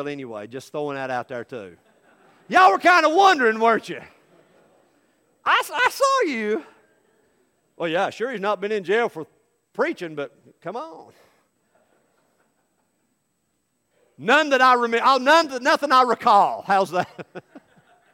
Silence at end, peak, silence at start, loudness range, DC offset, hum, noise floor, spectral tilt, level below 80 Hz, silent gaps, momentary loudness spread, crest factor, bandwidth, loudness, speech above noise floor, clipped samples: 0.55 s; -2 dBFS; 0 s; 15 LU; under 0.1%; none; -72 dBFS; -3.5 dB/octave; -74 dBFS; none; 20 LU; 20 dB; 16.5 kHz; -19 LUFS; 52 dB; under 0.1%